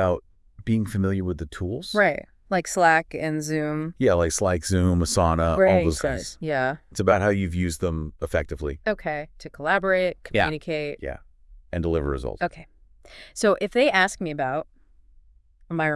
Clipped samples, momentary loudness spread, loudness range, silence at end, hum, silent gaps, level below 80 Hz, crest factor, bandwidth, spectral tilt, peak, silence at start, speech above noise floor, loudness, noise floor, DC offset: under 0.1%; 12 LU; 4 LU; 0 s; none; none; -42 dBFS; 20 dB; 12 kHz; -5 dB/octave; -4 dBFS; 0 s; 32 dB; -24 LUFS; -55 dBFS; under 0.1%